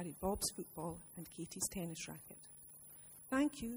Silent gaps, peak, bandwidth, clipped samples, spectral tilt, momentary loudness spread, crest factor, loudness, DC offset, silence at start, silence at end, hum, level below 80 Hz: none; -24 dBFS; over 20 kHz; under 0.1%; -4 dB/octave; 17 LU; 20 dB; -42 LUFS; under 0.1%; 0 s; 0 s; none; -62 dBFS